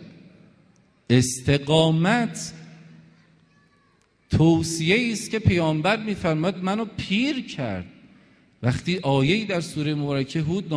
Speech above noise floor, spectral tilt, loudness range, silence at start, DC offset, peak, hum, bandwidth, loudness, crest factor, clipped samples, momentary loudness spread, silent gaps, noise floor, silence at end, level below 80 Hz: 40 dB; -5.5 dB/octave; 3 LU; 0 s; under 0.1%; -4 dBFS; none; 11 kHz; -23 LUFS; 20 dB; under 0.1%; 9 LU; none; -63 dBFS; 0 s; -48 dBFS